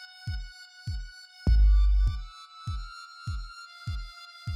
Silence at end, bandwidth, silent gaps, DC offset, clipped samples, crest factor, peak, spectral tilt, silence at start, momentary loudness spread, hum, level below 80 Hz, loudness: 0 s; 7.4 kHz; none; under 0.1%; under 0.1%; 14 dB; -14 dBFS; -6 dB/octave; 0 s; 20 LU; none; -28 dBFS; -31 LUFS